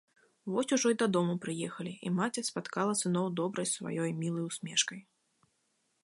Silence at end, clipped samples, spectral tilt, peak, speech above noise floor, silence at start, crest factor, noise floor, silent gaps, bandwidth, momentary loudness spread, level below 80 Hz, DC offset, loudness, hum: 1.05 s; under 0.1%; -4 dB/octave; -14 dBFS; 45 dB; 0.45 s; 20 dB; -77 dBFS; none; 11.5 kHz; 9 LU; -80 dBFS; under 0.1%; -33 LUFS; none